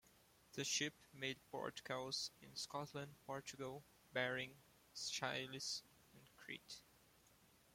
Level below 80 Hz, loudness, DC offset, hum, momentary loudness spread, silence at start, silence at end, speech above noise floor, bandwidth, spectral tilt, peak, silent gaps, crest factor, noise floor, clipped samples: -82 dBFS; -47 LUFS; under 0.1%; none; 13 LU; 0.5 s; 0.3 s; 24 dB; 16.5 kHz; -2 dB/octave; -26 dBFS; none; 22 dB; -72 dBFS; under 0.1%